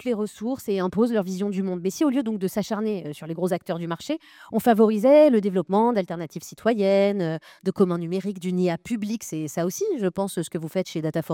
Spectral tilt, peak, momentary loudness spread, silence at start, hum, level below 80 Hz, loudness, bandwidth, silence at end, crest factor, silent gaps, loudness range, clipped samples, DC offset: -6.5 dB/octave; -6 dBFS; 11 LU; 0 s; none; -66 dBFS; -24 LUFS; 18 kHz; 0 s; 16 dB; none; 6 LU; under 0.1%; under 0.1%